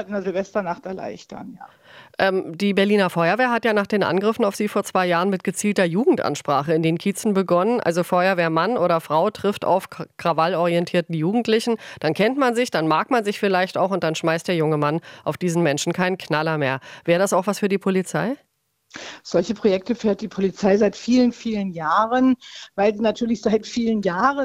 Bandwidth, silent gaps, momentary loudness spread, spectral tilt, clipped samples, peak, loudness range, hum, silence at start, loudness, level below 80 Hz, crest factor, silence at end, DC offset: 16 kHz; none; 7 LU; -5.5 dB/octave; under 0.1%; -4 dBFS; 3 LU; none; 0 s; -21 LUFS; -60 dBFS; 16 dB; 0 s; under 0.1%